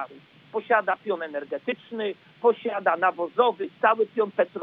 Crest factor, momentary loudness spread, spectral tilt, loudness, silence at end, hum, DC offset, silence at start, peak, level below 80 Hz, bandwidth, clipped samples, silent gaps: 20 dB; 9 LU; -7 dB/octave; -25 LUFS; 0 s; none; under 0.1%; 0 s; -6 dBFS; -88 dBFS; 4.6 kHz; under 0.1%; none